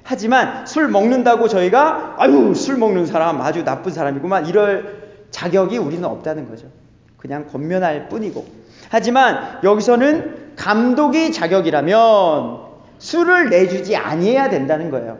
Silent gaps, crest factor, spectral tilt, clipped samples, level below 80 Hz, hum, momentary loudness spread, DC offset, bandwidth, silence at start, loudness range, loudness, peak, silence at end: none; 16 dB; -5.5 dB/octave; under 0.1%; -58 dBFS; none; 13 LU; under 0.1%; 7.6 kHz; 0.05 s; 7 LU; -16 LUFS; 0 dBFS; 0 s